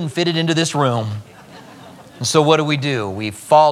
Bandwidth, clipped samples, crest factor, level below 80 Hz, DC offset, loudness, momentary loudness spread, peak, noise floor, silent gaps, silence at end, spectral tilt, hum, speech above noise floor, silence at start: 15 kHz; under 0.1%; 18 dB; -62 dBFS; under 0.1%; -17 LUFS; 11 LU; 0 dBFS; -40 dBFS; none; 0 s; -4.5 dB/octave; none; 24 dB; 0 s